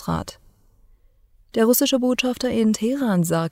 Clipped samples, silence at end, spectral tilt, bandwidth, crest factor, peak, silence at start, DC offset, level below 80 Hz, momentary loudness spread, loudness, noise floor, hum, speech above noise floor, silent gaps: under 0.1%; 0 s; -5 dB/octave; 16 kHz; 16 dB; -6 dBFS; 0 s; under 0.1%; -52 dBFS; 11 LU; -21 LUFS; -56 dBFS; none; 35 dB; none